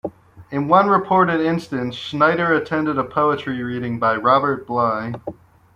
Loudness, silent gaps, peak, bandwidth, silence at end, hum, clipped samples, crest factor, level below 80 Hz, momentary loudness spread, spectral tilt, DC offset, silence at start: -19 LUFS; none; -2 dBFS; 11.5 kHz; 0.4 s; none; under 0.1%; 18 dB; -56 dBFS; 10 LU; -7.5 dB/octave; under 0.1%; 0.05 s